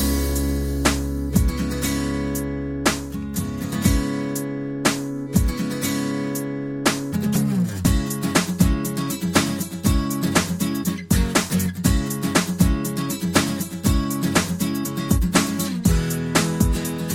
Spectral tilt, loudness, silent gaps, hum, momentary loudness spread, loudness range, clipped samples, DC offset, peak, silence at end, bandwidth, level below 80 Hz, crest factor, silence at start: -4.5 dB/octave; -22 LUFS; none; none; 5 LU; 2 LU; under 0.1%; under 0.1%; -2 dBFS; 0 s; 17 kHz; -30 dBFS; 18 dB; 0 s